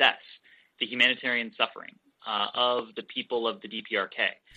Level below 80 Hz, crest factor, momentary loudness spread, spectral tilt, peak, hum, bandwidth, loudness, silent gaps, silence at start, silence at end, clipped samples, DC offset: -76 dBFS; 22 dB; 15 LU; -3.5 dB/octave; -8 dBFS; none; 8.6 kHz; -28 LUFS; none; 0 s; 0.25 s; under 0.1%; under 0.1%